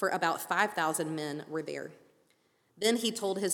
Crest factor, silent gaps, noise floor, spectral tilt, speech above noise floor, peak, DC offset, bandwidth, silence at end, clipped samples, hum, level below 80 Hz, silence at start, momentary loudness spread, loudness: 20 dB; none; -71 dBFS; -3 dB/octave; 39 dB; -12 dBFS; under 0.1%; 19.5 kHz; 0 s; under 0.1%; none; -84 dBFS; 0 s; 10 LU; -32 LUFS